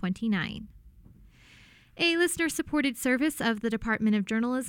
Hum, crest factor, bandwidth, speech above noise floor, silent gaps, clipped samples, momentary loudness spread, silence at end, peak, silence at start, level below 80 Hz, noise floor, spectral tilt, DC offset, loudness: none; 16 dB; 17.5 kHz; 28 dB; none; under 0.1%; 5 LU; 0 s; -14 dBFS; 0 s; -54 dBFS; -56 dBFS; -4 dB/octave; under 0.1%; -27 LUFS